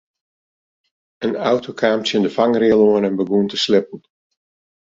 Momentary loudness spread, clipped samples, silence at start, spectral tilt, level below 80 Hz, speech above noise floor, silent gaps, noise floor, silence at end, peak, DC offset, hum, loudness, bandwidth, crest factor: 8 LU; under 0.1%; 1.2 s; -5.5 dB/octave; -58 dBFS; over 73 dB; none; under -90 dBFS; 0.95 s; -2 dBFS; under 0.1%; none; -17 LUFS; 7.8 kHz; 18 dB